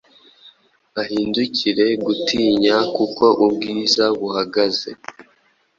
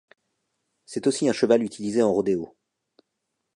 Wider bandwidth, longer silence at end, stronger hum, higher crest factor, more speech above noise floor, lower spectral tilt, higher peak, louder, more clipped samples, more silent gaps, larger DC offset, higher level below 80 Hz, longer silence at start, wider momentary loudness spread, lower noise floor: second, 7.6 kHz vs 11.5 kHz; second, 0.55 s vs 1.1 s; neither; about the same, 18 dB vs 20 dB; second, 42 dB vs 57 dB; about the same, -4 dB/octave vs -5 dB/octave; first, -2 dBFS vs -6 dBFS; first, -18 LUFS vs -23 LUFS; neither; neither; neither; first, -58 dBFS vs -66 dBFS; second, 0.45 s vs 0.9 s; about the same, 11 LU vs 9 LU; second, -60 dBFS vs -80 dBFS